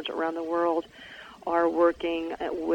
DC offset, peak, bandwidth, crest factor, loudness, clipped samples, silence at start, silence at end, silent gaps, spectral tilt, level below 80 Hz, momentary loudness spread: under 0.1%; -10 dBFS; 16.5 kHz; 16 dB; -27 LUFS; under 0.1%; 0 s; 0 s; none; -5.5 dB/octave; -60 dBFS; 18 LU